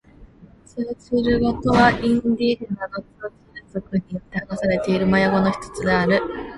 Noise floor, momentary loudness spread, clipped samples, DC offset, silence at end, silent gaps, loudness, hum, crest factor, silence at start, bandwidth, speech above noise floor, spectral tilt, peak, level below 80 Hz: -48 dBFS; 16 LU; under 0.1%; under 0.1%; 0 s; none; -21 LUFS; none; 20 dB; 0.2 s; 11.5 kHz; 28 dB; -6.5 dB/octave; -2 dBFS; -42 dBFS